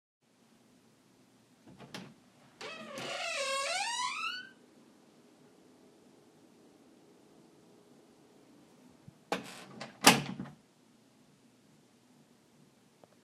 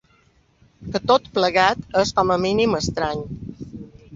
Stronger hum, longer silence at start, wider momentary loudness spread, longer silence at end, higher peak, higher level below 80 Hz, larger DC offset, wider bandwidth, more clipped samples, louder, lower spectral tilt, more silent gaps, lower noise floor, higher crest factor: neither; first, 1.65 s vs 0.8 s; first, 25 LU vs 19 LU; first, 2.7 s vs 0 s; about the same, -2 dBFS vs -2 dBFS; second, -78 dBFS vs -46 dBFS; neither; first, 15 kHz vs 7.8 kHz; neither; second, -32 LUFS vs -20 LUFS; second, -2 dB/octave vs -4.5 dB/octave; neither; first, -66 dBFS vs -59 dBFS; first, 38 dB vs 20 dB